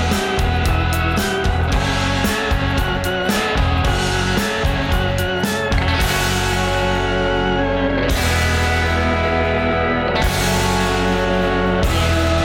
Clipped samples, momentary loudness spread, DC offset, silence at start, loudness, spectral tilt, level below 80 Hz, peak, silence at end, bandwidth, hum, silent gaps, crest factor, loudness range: under 0.1%; 2 LU; under 0.1%; 0 s; -18 LUFS; -5 dB/octave; -24 dBFS; -8 dBFS; 0 s; 17 kHz; none; none; 10 dB; 1 LU